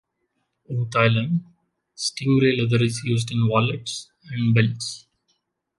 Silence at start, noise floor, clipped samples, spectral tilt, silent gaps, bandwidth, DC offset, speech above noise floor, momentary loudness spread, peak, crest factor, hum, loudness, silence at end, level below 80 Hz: 0.7 s; -74 dBFS; under 0.1%; -5.5 dB/octave; none; 11.5 kHz; under 0.1%; 53 dB; 12 LU; -2 dBFS; 20 dB; none; -22 LUFS; 0.8 s; -56 dBFS